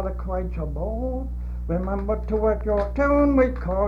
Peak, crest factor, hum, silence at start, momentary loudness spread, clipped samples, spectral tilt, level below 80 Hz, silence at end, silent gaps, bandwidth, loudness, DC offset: -8 dBFS; 14 dB; 60 Hz at -30 dBFS; 0 s; 10 LU; under 0.1%; -10 dB/octave; -28 dBFS; 0 s; none; 5.2 kHz; -24 LUFS; under 0.1%